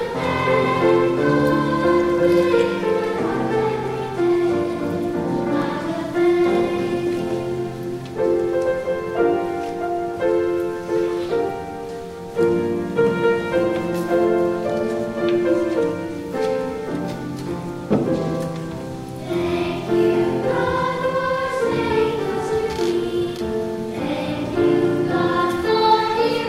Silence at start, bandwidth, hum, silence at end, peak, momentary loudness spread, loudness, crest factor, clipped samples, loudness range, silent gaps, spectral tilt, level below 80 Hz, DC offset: 0 s; 14 kHz; none; 0 s; -4 dBFS; 9 LU; -21 LUFS; 16 dB; under 0.1%; 4 LU; none; -6.5 dB/octave; -48 dBFS; under 0.1%